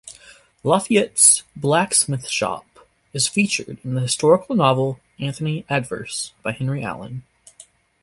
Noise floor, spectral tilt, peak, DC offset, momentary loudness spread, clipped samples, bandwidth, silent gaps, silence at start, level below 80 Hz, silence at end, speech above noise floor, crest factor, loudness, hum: -50 dBFS; -3.5 dB/octave; 0 dBFS; under 0.1%; 15 LU; under 0.1%; 12 kHz; none; 0.05 s; -58 dBFS; 0.4 s; 30 dB; 22 dB; -19 LUFS; none